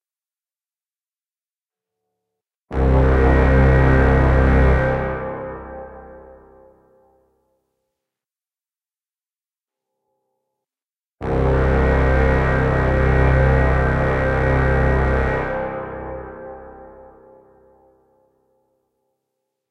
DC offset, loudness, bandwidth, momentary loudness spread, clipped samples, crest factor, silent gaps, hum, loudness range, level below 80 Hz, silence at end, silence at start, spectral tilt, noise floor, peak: under 0.1%; -17 LUFS; 6 kHz; 17 LU; under 0.1%; 20 dB; none; none; 16 LU; -24 dBFS; 2.85 s; 2.7 s; -9 dB/octave; under -90 dBFS; 0 dBFS